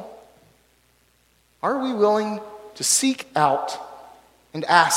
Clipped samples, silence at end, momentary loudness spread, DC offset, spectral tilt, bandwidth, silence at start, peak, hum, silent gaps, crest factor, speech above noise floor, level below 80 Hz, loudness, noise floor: under 0.1%; 0 s; 18 LU; under 0.1%; -2.5 dB/octave; 16.5 kHz; 0 s; 0 dBFS; none; none; 24 dB; 41 dB; -68 dBFS; -22 LUFS; -62 dBFS